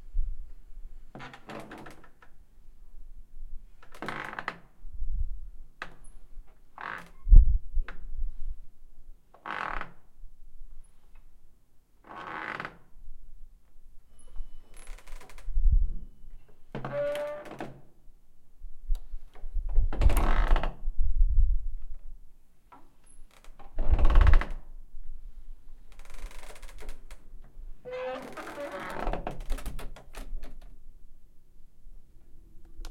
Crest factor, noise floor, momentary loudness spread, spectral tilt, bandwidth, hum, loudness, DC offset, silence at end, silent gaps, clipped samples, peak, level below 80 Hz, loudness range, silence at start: 24 dB; -55 dBFS; 26 LU; -6.5 dB/octave; 12 kHz; none; -33 LUFS; under 0.1%; 0 s; none; under 0.1%; -4 dBFS; -30 dBFS; 14 LU; 0 s